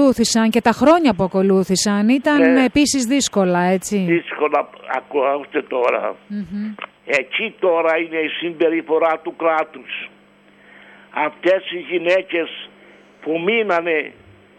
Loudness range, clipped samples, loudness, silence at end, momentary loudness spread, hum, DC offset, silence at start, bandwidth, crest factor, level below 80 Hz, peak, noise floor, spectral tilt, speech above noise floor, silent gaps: 7 LU; under 0.1%; -18 LUFS; 0.45 s; 14 LU; 50 Hz at -50 dBFS; under 0.1%; 0 s; 15 kHz; 16 dB; -54 dBFS; -2 dBFS; -50 dBFS; -4.5 dB/octave; 32 dB; none